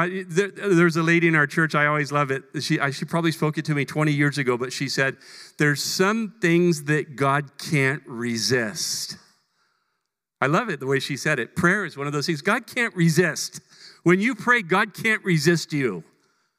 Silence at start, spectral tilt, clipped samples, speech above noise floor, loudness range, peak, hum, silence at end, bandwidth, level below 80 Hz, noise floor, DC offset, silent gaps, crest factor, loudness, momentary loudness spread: 0 s; -5 dB/octave; under 0.1%; 57 dB; 4 LU; -4 dBFS; none; 0.55 s; 16 kHz; -70 dBFS; -79 dBFS; under 0.1%; none; 20 dB; -22 LUFS; 7 LU